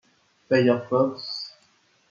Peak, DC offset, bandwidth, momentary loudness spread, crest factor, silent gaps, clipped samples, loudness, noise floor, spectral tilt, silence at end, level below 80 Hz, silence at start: -8 dBFS; under 0.1%; 7.2 kHz; 13 LU; 18 dB; none; under 0.1%; -24 LUFS; -63 dBFS; -6.5 dB/octave; 0.6 s; -74 dBFS; 0.5 s